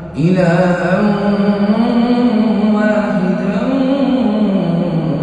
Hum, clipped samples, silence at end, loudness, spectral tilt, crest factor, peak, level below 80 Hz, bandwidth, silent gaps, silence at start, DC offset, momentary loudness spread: none; under 0.1%; 0 s; -14 LUFS; -8.5 dB/octave; 12 dB; -2 dBFS; -42 dBFS; 8.8 kHz; none; 0 s; under 0.1%; 3 LU